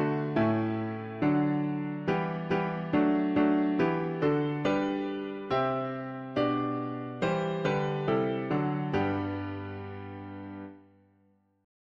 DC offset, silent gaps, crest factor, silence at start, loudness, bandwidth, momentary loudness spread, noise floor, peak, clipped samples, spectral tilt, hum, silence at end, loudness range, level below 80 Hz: under 0.1%; none; 16 dB; 0 s; -30 LUFS; 7.4 kHz; 13 LU; -68 dBFS; -14 dBFS; under 0.1%; -8.5 dB/octave; none; 1.1 s; 4 LU; -62 dBFS